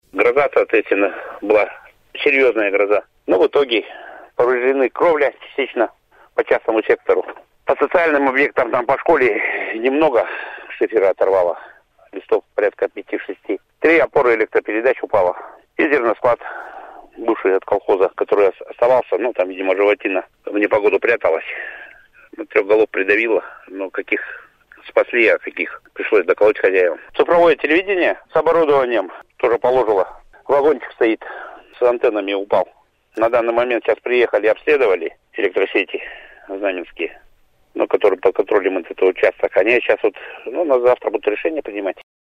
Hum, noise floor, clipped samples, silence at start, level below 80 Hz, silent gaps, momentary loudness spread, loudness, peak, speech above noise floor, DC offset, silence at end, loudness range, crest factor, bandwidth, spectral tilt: none; -53 dBFS; under 0.1%; 0.15 s; -56 dBFS; none; 13 LU; -17 LUFS; 0 dBFS; 36 dB; under 0.1%; 0.4 s; 3 LU; 18 dB; 6.6 kHz; -6 dB/octave